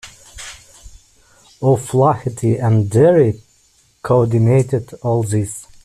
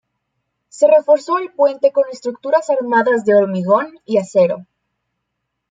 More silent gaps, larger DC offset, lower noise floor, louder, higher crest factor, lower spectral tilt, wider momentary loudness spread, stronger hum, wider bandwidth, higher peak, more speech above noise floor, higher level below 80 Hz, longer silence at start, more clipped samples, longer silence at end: neither; neither; second, -55 dBFS vs -75 dBFS; about the same, -16 LUFS vs -15 LUFS; about the same, 14 dB vs 14 dB; first, -7.5 dB/octave vs -6 dB/octave; first, 21 LU vs 7 LU; neither; first, 13 kHz vs 9.2 kHz; about the same, -2 dBFS vs -2 dBFS; second, 41 dB vs 60 dB; first, -48 dBFS vs -68 dBFS; second, 0.05 s vs 0.75 s; neither; second, 0.2 s vs 1.05 s